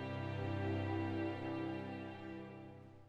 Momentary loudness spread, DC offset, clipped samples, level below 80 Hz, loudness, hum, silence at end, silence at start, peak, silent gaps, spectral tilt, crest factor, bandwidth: 12 LU; under 0.1%; under 0.1%; -70 dBFS; -43 LUFS; none; 0 s; 0 s; -30 dBFS; none; -8.5 dB/octave; 14 dB; 7.4 kHz